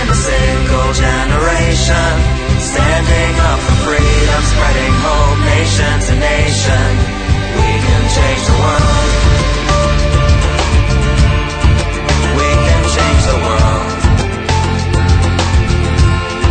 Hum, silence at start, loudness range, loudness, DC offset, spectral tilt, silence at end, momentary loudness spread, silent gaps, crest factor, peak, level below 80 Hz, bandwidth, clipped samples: none; 0 s; 1 LU; -12 LUFS; under 0.1%; -5 dB/octave; 0 s; 3 LU; none; 10 dB; 0 dBFS; -14 dBFS; 9.4 kHz; under 0.1%